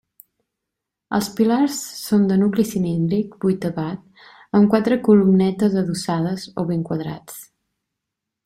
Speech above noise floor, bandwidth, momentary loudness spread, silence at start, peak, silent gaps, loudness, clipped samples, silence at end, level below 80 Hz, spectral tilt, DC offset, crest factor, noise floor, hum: 64 dB; 15 kHz; 12 LU; 1.1 s; -2 dBFS; none; -20 LUFS; under 0.1%; 1.05 s; -58 dBFS; -6.5 dB/octave; under 0.1%; 18 dB; -82 dBFS; none